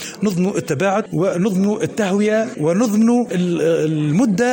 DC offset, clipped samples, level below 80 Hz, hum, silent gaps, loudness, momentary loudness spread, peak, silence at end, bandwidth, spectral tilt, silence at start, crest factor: under 0.1%; under 0.1%; -58 dBFS; none; none; -18 LUFS; 4 LU; -4 dBFS; 0 s; 17 kHz; -6.5 dB/octave; 0 s; 12 dB